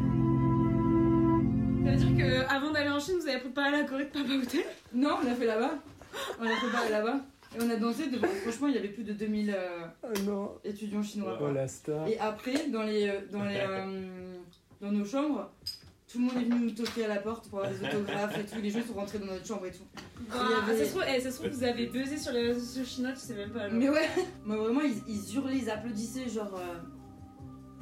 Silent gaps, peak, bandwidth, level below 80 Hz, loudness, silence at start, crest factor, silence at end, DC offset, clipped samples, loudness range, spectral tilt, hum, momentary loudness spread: none; -16 dBFS; 16 kHz; -52 dBFS; -31 LUFS; 0 s; 14 dB; 0 s; under 0.1%; under 0.1%; 6 LU; -6 dB/octave; none; 13 LU